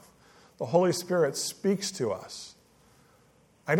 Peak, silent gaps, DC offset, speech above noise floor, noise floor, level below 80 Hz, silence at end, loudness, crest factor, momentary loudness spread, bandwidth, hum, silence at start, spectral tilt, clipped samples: -10 dBFS; none; under 0.1%; 34 dB; -62 dBFS; -72 dBFS; 0 s; -28 LUFS; 22 dB; 17 LU; 17 kHz; none; 0.6 s; -4.5 dB/octave; under 0.1%